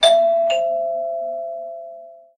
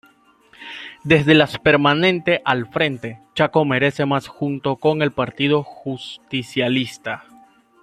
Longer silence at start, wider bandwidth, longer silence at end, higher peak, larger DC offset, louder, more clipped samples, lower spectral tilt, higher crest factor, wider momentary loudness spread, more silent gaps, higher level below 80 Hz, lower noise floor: second, 0 s vs 0.6 s; second, 9.8 kHz vs 13.5 kHz; second, 0.2 s vs 0.65 s; about the same, -2 dBFS vs 0 dBFS; neither; about the same, -20 LUFS vs -19 LUFS; neither; second, 0 dB/octave vs -6.5 dB/octave; about the same, 18 dB vs 20 dB; first, 20 LU vs 16 LU; neither; second, -68 dBFS vs -54 dBFS; second, -40 dBFS vs -54 dBFS